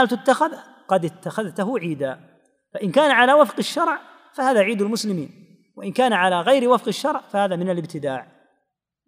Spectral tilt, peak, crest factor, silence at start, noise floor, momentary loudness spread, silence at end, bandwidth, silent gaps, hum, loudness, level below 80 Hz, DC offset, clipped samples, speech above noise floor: -5 dB/octave; -2 dBFS; 20 dB; 0 s; -76 dBFS; 13 LU; 0.85 s; 15.5 kHz; none; none; -20 LUFS; -78 dBFS; under 0.1%; under 0.1%; 56 dB